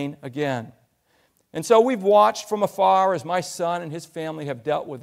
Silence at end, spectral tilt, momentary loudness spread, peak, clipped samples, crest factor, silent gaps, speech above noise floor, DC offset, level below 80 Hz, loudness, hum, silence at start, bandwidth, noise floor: 0 s; -5 dB/octave; 14 LU; -4 dBFS; under 0.1%; 18 dB; none; 43 dB; under 0.1%; -70 dBFS; -22 LUFS; none; 0 s; 16 kHz; -65 dBFS